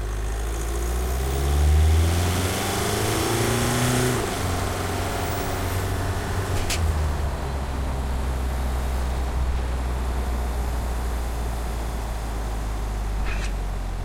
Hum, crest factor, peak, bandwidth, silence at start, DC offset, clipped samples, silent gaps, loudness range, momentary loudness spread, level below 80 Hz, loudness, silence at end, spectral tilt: none; 14 dB; -10 dBFS; 16.5 kHz; 0 s; under 0.1%; under 0.1%; none; 7 LU; 8 LU; -28 dBFS; -25 LUFS; 0 s; -5 dB/octave